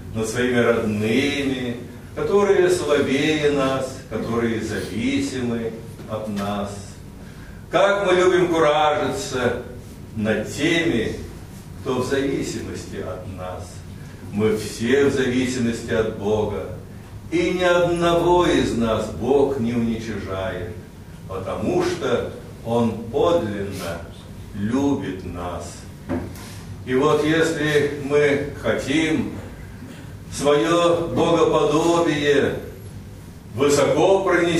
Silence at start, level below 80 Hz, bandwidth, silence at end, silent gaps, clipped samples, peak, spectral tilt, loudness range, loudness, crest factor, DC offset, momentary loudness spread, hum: 0 s; -44 dBFS; 15.5 kHz; 0 s; none; under 0.1%; -4 dBFS; -5.5 dB/octave; 6 LU; -21 LUFS; 18 dB; under 0.1%; 19 LU; none